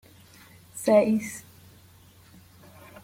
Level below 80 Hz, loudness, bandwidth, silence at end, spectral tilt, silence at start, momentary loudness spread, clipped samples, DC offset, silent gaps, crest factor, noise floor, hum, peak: -66 dBFS; -24 LUFS; 16.5 kHz; 1.65 s; -5.5 dB/octave; 0.75 s; 22 LU; under 0.1%; under 0.1%; none; 22 dB; -54 dBFS; none; -8 dBFS